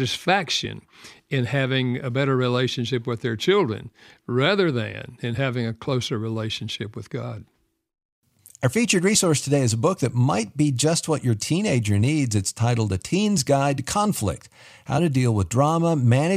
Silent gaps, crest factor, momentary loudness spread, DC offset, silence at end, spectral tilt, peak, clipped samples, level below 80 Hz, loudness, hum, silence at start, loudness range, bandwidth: 8.05-8.22 s; 18 dB; 10 LU; under 0.1%; 0 s; -5 dB/octave; -6 dBFS; under 0.1%; -54 dBFS; -22 LUFS; none; 0 s; 6 LU; 15.5 kHz